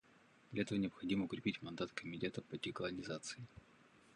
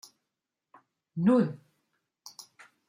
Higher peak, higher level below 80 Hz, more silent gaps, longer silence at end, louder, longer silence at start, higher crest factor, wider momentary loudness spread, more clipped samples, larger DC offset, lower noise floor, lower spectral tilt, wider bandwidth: second, -24 dBFS vs -14 dBFS; about the same, -72 dBFS vs -76 dBFS; neither; second, 0 s vs 1.3 s; second, -43 LUFS vs -27 LUFS; second, 0.5 s vs 1.15 s; about the same, 20 dB vs 20 dB; second, 9 LU vs 25 LU; neither; neither; second, -68 dBFS vs -87 dBFS; second, -5 dB/octave vs -7.5 dB/octave; second, 11 kHz vs 15 kHz